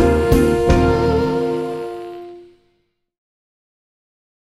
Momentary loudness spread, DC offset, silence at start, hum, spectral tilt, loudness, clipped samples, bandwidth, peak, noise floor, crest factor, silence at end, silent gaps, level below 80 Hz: 18 LU; under 0.1%; 0 s; none; -7 dB/octave; -17 LUFS; under 0.1%; 15.5 kHz; -2 dBFS; -66 dBFS; 18 dB; 2.15 s; none; -28 dBFS